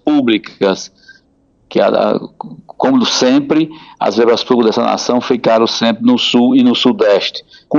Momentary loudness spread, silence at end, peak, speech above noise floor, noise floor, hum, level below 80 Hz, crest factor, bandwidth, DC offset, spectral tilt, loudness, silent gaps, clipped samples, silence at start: 10 LU; 0 s; 0 dBFS; 42 dB; -54 dBFS; none; -58 dBFS; 12 dB; 7.4 kHz; under 0.1%; -4.5 dB/octave; -13 LUFS; none; under 0.1%; 0.05 s